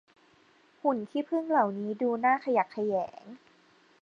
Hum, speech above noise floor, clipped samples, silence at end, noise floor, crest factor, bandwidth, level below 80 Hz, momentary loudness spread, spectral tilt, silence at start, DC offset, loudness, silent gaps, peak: none; 34 dB; under 0.1%; 0.65 s; -63 dBFS; 18 dB; 7.4 kHz; -80 dBFS; 7 LU; -7.5 dB/octave; 0.85 s; under 0.1%; -29 LUFS; none; -12 dBFS